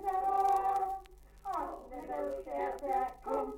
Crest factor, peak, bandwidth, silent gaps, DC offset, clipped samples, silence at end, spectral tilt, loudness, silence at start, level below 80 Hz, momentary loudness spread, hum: 14 dB; -20 dBFS; 17 kHz; none; under 0.1%; under 0.1%; 0 s; -5 dB/octave; -35 LUFS; 0 s; -58 dBFS; 13 LU; 50 Hz at -60 dBFS